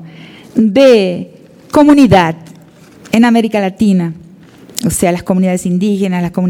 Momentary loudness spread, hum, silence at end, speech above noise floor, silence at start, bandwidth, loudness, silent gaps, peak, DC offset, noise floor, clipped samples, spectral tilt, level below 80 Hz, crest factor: 12 LU; none; 0 s; 29 dB; 0 s; 17 kHz; -11 LUFS; none; 0 dBFS; under 0.1%; -39 dBFS; 0.4%; -6 dB/octave; -42 dBFS; 12 dB